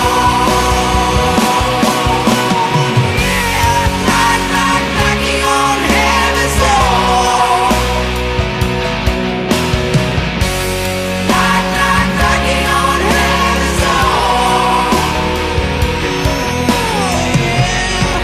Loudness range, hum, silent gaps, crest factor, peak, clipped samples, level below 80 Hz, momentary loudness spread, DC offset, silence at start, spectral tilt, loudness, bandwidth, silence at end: 3 LU; none; none; 12 dB; 0 dBFS; under 0.1%; -22 dBFS; 4 LU; under 0.1%; 0 s; -4 dB/octave; -12 LUFS; 15.5 kHz; 0 s